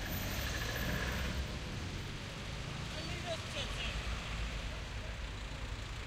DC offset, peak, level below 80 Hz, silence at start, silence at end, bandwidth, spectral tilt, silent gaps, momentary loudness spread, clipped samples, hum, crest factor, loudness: under 0.1%; -24 dBFS; -44 dBFS; 0 s; 0 s; 14.5 kHz; -4 dB/octave; none; 7 LU; under 0.1%; none; 16 dB; -40 LUFS